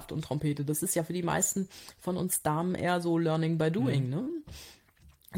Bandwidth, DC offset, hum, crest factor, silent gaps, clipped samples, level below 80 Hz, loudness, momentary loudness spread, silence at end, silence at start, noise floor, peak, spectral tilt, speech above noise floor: 17 kHz; under 0.1%; none; 16 dB; none; under 0.1%; -60 dBFS; -30 LUFS; 11 LU; 0 s; 0 s; -60 dBFS; -14 dBFS; -5 dB/octave; 30 dB